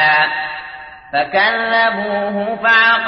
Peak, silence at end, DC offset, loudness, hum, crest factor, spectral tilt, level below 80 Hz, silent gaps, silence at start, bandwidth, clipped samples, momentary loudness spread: -2 dBFS; 0 s; under 0.1%; -15 LUFS; none; 14 dB; -5 dB/octave; -54 dBFS; none; 0 s; 6.2 kHz; under 0.1%; 15 LU